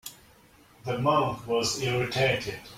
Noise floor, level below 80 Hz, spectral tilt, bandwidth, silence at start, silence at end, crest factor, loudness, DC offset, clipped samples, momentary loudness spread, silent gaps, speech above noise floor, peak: -57 dBFS; -56 dBFS; -4 dB/octave; 16.5 kHz; 0.05 s; 0 s; 18 dB; -27 LUFS; under 0.1%; under 0.1%; 10 LU; none; 30 dB; -12 dBFS